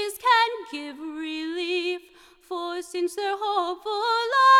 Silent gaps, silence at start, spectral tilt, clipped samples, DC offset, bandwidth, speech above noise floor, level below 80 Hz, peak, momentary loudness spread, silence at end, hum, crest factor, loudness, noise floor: none; 0 s; 0 dB/octave; under 0.1%; under 0.1%; 16.5 kHz; 31 dB; -70 dBFS; -8 dBFS; 14 LU; 0 s; none; 16 dB; -26 LUFS; -53 dBFS